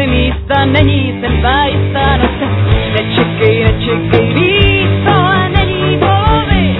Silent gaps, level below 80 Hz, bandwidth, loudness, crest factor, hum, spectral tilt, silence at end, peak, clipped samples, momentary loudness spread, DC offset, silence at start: none; -20 dBFS; 4.1 kHz; -11 LUFS; 10 dB; none; -9.5 dB/octave; 0 s; 0 dBFS; 0.2%; 4 LU; under 0.1%; 0 s